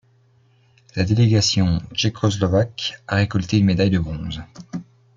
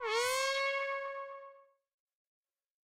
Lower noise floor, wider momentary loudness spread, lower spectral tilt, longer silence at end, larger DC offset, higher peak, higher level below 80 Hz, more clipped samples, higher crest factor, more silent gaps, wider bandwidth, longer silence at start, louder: about the same, -57 dBFS vs -59 dBFS; about the same, 17 LU vs 15 LU; first, -5.5 dB/octave vs 2 dB/octave; second, 0.35 s vs 1.35 s; neither; first, -4 dBFS vs -22 dBFS; first, -44 dBFS vs -82 dBFS; neither; about the same, 16 dB vs 18 dB; neither; second, 7.6 kHz vs 16 kHz; first, 0.95 s vs 0 s; first, -20 LUFS vs -34 LUFS